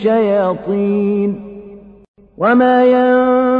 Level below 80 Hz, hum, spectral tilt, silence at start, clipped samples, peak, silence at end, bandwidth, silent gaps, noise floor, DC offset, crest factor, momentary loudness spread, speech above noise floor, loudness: -52 dBFS; none; -9.5 dB/octave; 0 s; under 0.1%; -2 dBFS; 0 s; 4.9 kHz; 2.08-2.14 s; -36 dBFS; under 0.1%; 12 dB; 13 LU; 24 dB; -13 LUFS